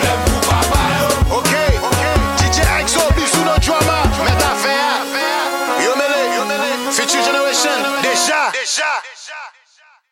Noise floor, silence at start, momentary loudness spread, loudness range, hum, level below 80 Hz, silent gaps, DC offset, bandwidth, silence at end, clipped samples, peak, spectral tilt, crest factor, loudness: -51 dBFS; 0 s; 4 LU; 2 LU; none; -24 dBFS; none; under 0.1%; 16.5 kHz; 0.65 s; under 0.1%; 0 dBFS; -3.5 dB/octave; 16 dB; -15 LUFS